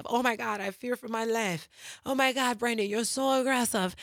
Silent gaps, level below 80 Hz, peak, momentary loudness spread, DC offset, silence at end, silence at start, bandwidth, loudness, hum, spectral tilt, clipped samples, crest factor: none; -70 dBFS; -10 dBFS; 9 LU; under 0.1%; 0 s; 0 s; 19 kHz; -29 LUFS; none; -3 dB/octave; under 0.1%; 18 dB